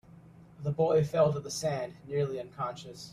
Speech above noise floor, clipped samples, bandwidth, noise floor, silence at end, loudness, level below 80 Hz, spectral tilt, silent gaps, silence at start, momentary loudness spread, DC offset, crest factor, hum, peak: 23 dB; under 0.1%; 14.5 kHz; -54 dBFS; 0 s; -31 LUFS; -64 dBFS; -6 dB/octave; none; 0.15 s; 11 LU; under 0.1%; 18 dB; none; -14 dBFS